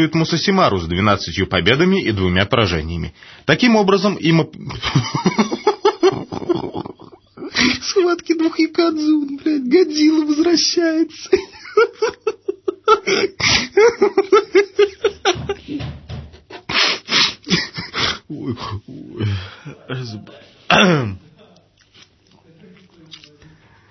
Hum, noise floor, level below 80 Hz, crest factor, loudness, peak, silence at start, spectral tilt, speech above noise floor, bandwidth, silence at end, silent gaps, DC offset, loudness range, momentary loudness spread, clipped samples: none; -52 dBFS; -44 dBFS; 18 dB; -17 LUFS; 0 dBFS; 0 s; -4.5 dB/octave; 36 dB; 6.4 kHz; 2.7 s; none; under 0.1%; 5 LU; 15 LU; under 0.1%